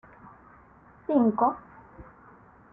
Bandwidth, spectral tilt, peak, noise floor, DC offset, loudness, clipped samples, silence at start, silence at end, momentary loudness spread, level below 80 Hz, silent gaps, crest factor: 3.8 kHz; -11.5 dB/octave; -10 dBFS; -55 dBFS; under 0.1%; -25 LUFS; under 0.1%; 1.1 s; 0.7 s; 20 LU; -62 dBFS; none; 20 dB